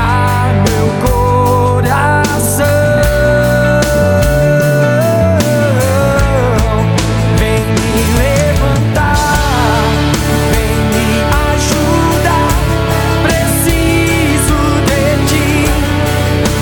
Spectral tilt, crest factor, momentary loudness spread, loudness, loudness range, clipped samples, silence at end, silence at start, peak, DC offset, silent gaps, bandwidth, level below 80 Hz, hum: -5.5 dB/octave; 10 dB; 2 LU; -11 LUFS; 1 LU; under 0.1%; 0 s; 0 s; 0 dBFS; under 0.1%; none; 19.5 kHz; -20 dBFS; none